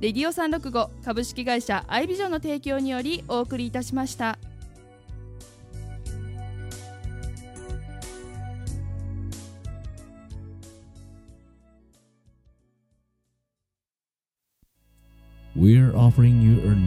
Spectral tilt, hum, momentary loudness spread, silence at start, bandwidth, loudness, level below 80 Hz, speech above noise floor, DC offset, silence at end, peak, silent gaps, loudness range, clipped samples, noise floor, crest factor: -7 dB/octave; none; 25 LU; 0 s; 13.5 kHz; -24 LUFS; -42 dBFS; over 69 dB; under 0.1%; 0 s; -4 dBFS; none; 20 LU; under 0.1%; under -90 dBFS; 20 dB